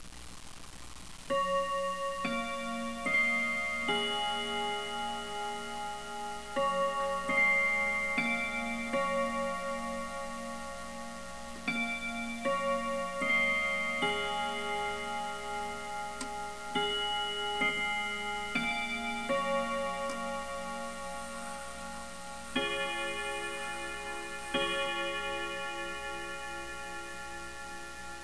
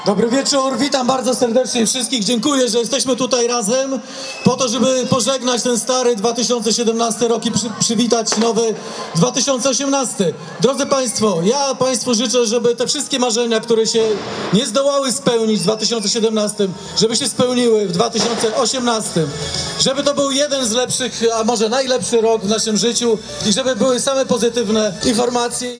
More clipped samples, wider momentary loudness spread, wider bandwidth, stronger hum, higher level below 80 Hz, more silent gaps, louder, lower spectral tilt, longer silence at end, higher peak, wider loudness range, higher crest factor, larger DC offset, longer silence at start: neither; first, 13 LU vs 4 LU; about the same, 11 kHz vs 10.5 kHz; neither; about the same, -56 dBFS vs -52 dBFS; neither; second, -33 LUFS vs -16 LUFS; about the same, -2.5 dB/octave vs -3.5 dB/octave; about the same, 0 s vs 0 s; second, -18 dBFS vs 0 dBFS; first, 6 LU vs 1 LU; about the same, 16 dB vs 16 dB; first, 0.4% vs under 0.1%; about the same, 0 s vs 0 s